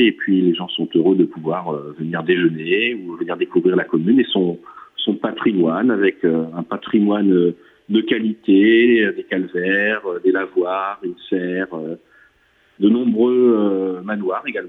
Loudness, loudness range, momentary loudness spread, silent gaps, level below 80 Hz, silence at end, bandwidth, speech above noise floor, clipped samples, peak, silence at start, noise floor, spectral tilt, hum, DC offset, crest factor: -18 LUFS; 4 LU; 11 LU; none; -66 dBFS; 0 s; 4 kHz; 40 dB; under 0.1%; -4 dBFS; 0 s; -58 dBFS; -9 dB/octave; none; under 0.1%; 14 dB